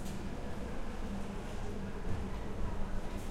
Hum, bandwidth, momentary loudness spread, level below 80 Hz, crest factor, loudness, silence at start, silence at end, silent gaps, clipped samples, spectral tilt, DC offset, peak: none; 13 kHz; 2 LU; -40 dBFS; 14 dB; -42 LUFS; 0 s; 0 s; none; under 0.1%; -6.5 dB/octave; under 0.1%; -22 dBFS